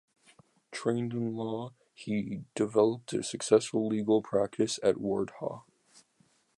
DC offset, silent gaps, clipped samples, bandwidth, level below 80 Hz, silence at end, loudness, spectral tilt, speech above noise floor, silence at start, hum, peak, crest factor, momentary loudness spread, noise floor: under 0.1%; none; under 0.1%; 11.5 kHz; -70 dBFS; 0.95 s; -31 LUFS; -5.5 dB/octave; 39 dB; 0.7 s; none; -10 dBFS; 22 dB; 13 LU; -69 dBFS